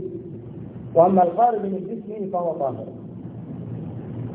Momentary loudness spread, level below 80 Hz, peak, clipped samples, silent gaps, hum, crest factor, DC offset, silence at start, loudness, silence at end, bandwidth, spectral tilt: 20 LU; -56 dBFS; -4 dBFS; under 0.1%; none; none; 20 dB; under 0.1%; 0 s; -22 LUFS; 0 s; 3.8 kHz; -12.5 dB/octave